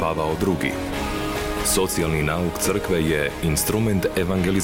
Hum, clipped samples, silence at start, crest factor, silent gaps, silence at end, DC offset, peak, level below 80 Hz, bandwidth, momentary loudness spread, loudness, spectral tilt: none; under 0.1%; 0 s; 12 dB; none; 0 s; 0.3%; -10 dBFS; -36 dBFS; 17 kHz; 5 LU; -22 LUFS; -4.5 dB/octave